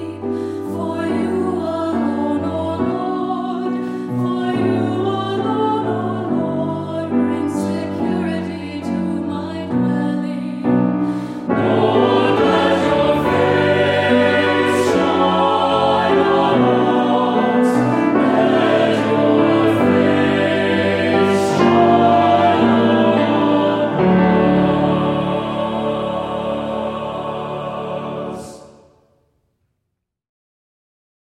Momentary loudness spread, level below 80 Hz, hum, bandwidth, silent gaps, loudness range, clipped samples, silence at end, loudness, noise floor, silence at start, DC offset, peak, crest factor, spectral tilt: 10 LU; -50 dBFS; none; 13 kHz; none; 9 LU; under 0.1%; 2.65 s; -17 LUFS; -76 dBFS; 0 s; under 0.1%; -2 dBFS; 14 dB; -7 dB/octave